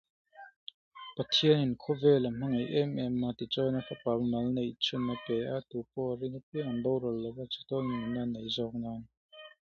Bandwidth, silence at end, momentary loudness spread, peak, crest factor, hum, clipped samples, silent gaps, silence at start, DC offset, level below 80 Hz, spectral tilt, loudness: 7.2 kHz; 0.15 s; 15 LU; -12 dBFS; 20 dB; none; under 0.1%; 0.56-0.67 s, 0.74-0.91 s, 6.43-6.52 s, 9.17-9.29 s; 0.35 s; under 0.1%; -64 dBFS; -6.5 dB/octave; -32 LUFS